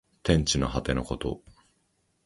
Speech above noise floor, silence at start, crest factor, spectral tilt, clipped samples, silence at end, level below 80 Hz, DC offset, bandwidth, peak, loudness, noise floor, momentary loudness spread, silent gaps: 45 dB; 0.25 s; 22 dB; -4.5 dB/octave; under 0.1%; 0.9 s; -40 dBFS; under 0.1%; 11.5 kHz; -6 dBFS; -27 LUFS; -72 dBFS; 11 LU; none